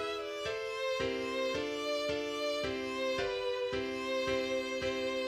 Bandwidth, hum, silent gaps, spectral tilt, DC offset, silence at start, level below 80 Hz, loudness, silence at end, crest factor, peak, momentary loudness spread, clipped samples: 15 kHz; none; none; -3.5 dB/octave; under 0.1%; 0 s; -60 dBFS; -35 LUFS; 0 s; 14 dB; -22 dBFS; 3 LU; under 0.1%